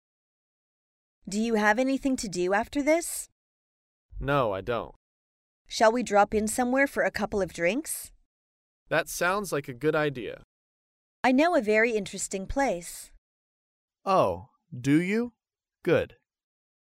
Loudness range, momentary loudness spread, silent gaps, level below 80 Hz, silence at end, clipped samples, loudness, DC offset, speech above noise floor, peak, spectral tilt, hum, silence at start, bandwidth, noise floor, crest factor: 3 LU; 14 LU; 3.32-4.09 s, 4.96-5.65 s, 8.26-8.86 s, 10.44-11.23 s, 13.18-13.88 s; -52 dBFS; 0.9 s; under 0.1%; -27 LUFS; under 0.1%; over 64 dB; -10 dBFS; -4.5 dB/octave; none; 1.25 s; 16 kHz; under -90 dBFS; 20 dB